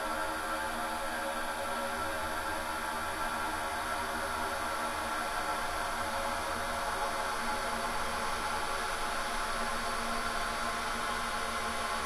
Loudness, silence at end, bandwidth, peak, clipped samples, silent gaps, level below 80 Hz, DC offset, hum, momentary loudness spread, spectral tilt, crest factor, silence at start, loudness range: -34 LUFS; 0 s; 16 kHz; -20 dBFS; under 0.1%; none; -48 dBFS; under 0.1%; none; 1 LU; -2 dB/octave; 14 dB; 0 s; 1 LU